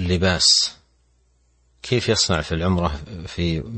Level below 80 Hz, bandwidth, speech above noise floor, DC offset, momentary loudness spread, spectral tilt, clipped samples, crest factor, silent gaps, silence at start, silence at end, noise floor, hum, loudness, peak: -38 dBFS; 8.8 kHz; 41 dB; under 0.1%; 15 LU; -3.5 dB/octave; under 0.1%; 18 dB; none; 0 s; 0 s; -61 dBFS; none; -19 LUFS; -4 dBFS